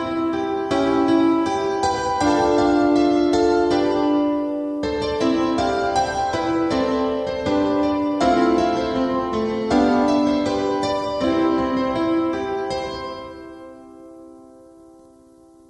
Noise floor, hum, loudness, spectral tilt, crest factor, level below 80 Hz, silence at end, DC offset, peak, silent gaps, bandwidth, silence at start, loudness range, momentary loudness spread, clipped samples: -49 dBFS; none; -20 LUFS; -5.5 dB/octave; 14 dB; -44 dBFS; 1.25 s; under 0.1%; -6 dBFS; none; 10 kHz; 0 s; 6 LU; 7 LU; under 0.1%